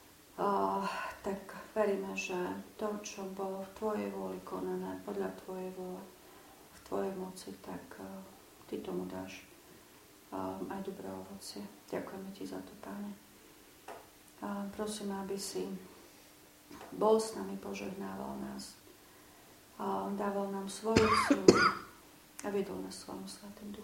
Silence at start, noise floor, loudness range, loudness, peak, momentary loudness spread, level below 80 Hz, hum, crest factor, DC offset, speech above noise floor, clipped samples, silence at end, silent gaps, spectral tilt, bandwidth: 0 s; -59 dBFS; 13 LU; -36 LUFS; -6 dBFS; 25 LU; -64 dBFS; none; 32 dB; under 0.1%; 23 dB; under 0.1%; 0 s; none; -4.5 dB/octave; 16.5 kHz